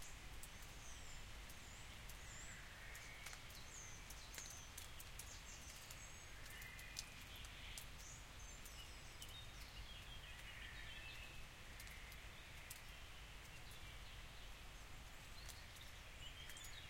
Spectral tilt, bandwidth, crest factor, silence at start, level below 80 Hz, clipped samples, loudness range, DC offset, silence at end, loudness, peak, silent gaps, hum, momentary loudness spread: -2 dB/octave; 16.5 kHz; 26 dB; 0 s; -60 dBFS; under 0.1%; 2 LU; under 0.1%; 0 s; -55 LUFS; -30 dBFS; none; none; 4 LU